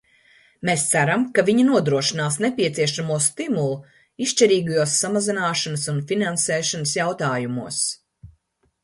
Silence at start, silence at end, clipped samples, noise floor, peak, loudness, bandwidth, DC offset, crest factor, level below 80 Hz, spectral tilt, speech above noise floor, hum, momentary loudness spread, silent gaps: 0.6 s; 0.55 s; under 0.1%; -66 dBFS; -2 dBFS; -21 LUFS; 11.5 kHz; under 0.1%; 20 dB; -62 dBFS; -3.5 dB/octave; 45 dB; none; 8 LU; none